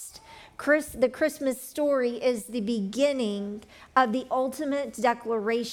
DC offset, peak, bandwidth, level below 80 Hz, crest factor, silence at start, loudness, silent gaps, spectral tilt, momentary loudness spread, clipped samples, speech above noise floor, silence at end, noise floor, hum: under 0.1%; -8 dBFS; 19 kHz; -62 dBFS; 20 dB; 0 s; -27 LUFS; none; -4.5 dB/octave; 9 LU; under 0.1%; 22 dB; 0 s; -49 dBFS; none